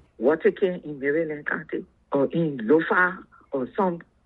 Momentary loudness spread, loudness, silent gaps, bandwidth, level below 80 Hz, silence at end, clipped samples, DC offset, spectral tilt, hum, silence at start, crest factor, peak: 10 LU; -25 LUFS; none; 4.2 kHz; -64 dBFS; 0.25 s; under 0.1%; under 0.1%; -9.5 dB/octave; none; 0.2 s; 18 dB; -6 dBFS